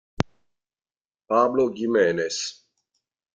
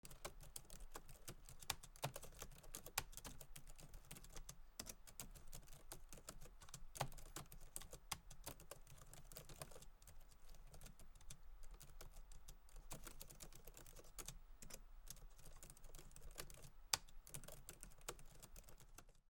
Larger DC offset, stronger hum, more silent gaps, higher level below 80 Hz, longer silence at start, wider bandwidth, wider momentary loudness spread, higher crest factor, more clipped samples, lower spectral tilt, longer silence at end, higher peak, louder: neither; neither; first, 1.01-1.05 s vs none; about the same, -56 dBFS vs -60 dBFS; first, 0.2 s vs 0.05 s; second, 9.4 kHz vs 19 kHz; second, 10 LU vs 14 LU; second, 22 dB vs 36 dB; neither; first, -4.5 dB/octave vs -2 dB/octave; first, 0.85 s vs 0 s; first, -2 dBFS vs -18 dBFS; first, -23 LUFS vs -55 LUFS